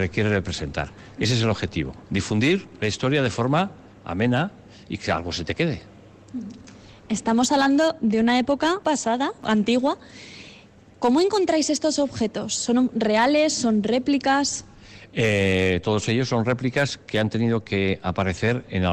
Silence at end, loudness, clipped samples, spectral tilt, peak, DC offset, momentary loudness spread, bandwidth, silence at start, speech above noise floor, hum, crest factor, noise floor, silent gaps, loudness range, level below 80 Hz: 0 s; -23 LUFS; under 0.1%; -5 dB/octave; -10 dBFS; under 0.1%; 11 LU; 11 kHz; 0 s; 27 dB; none; 12 dB; -49 dBFS; none; 4 LU; -50 dBFS